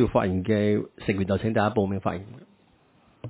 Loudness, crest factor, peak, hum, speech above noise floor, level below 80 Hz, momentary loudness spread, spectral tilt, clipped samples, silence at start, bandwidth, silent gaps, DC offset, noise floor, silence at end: -25 LUFS; 20 dB; -6 dBFS; none; 36 dB; -46 dBFS; 8 LU; -11.5 dB/octave; under 0.1%; 0 s; 4 kHz; none; under 0.1%; -61 dBFS; 0 s